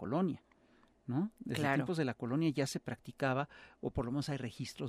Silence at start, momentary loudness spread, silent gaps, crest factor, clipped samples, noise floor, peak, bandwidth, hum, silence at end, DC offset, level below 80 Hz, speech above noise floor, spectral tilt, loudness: 0 s; 11 LU; none; 18 dB; under 0.1%; -68 dBFS; -18 dBFS; 15 kHz; none; 0 s; under 0.1%; -62 dBFS; 31 dB; -6 dB/octave; -37 LUFS